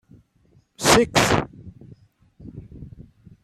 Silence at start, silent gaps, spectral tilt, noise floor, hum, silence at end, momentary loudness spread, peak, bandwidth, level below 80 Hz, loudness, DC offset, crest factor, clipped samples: 0.8 s; none; -3.5 dB/octave; -59 dBFS; none; 0.4 s; 26 LU; 0 dBFS; 16 kHz; -44 dBFS; -18 LUFS; under 0.1%; 24 dB; under 0.1%